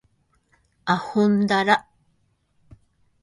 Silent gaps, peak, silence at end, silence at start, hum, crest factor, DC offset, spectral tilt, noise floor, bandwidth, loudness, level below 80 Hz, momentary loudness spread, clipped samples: none; -4 dBFS; 1.4 s; 0.85 s; none; 22 dB; under 0.1%; -6 dB/octave; -67 dBFS; 11.5 kHz; -21 LUFS; -62 dBFS; 6 LU; under 0.1%